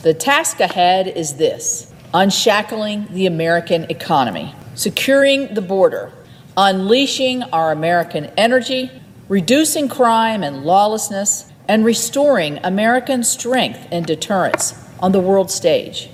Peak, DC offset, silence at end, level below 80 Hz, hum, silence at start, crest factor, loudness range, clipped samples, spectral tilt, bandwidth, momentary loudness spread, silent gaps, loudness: 0 dBFS; under 0.1%; 0.05 s; -58 dBFS; none; 0 s; 16 dB; 2 LU; under 0.1%; -3.5 dB/octave; 16 kHz; 8 LU; none; -16 LUFS